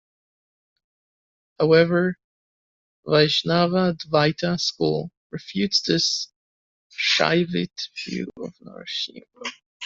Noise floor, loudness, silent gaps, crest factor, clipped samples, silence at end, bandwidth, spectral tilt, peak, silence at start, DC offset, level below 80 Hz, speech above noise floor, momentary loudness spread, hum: under -90 dBFS; -22 LUFS; 2.24-3.03 s, 5.17-5.30 s, 6.36-6.90 s, 9.66-9.80 s; 22 dB; under 0.1%; 0 s; 7.8 kHz; -4.5 dB/octave; -2 dBFS; 1.6 s; under 0.1%; -62 dBFS; over 68 dB; 17 LU; none